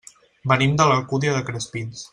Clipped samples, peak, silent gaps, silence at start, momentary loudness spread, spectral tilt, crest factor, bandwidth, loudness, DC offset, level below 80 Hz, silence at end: under 0.1%; -2 dBFS; none; 0.45 s; 13 LU; -5 dB/octave; 20 dB; 11 kHz; -20 LUFS; under 0.1%; -54 dBFS; 0.05 s